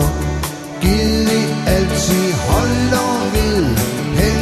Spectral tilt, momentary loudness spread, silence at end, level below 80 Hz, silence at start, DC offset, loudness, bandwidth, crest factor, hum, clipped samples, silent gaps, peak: -5 dB/octave; 5 LU; 0 s; -24 dBFS; 0 s; under 0.1%; -16 LUFS; 14 kHz; 14 dB; none; under 0.1%; none; 0 dBFS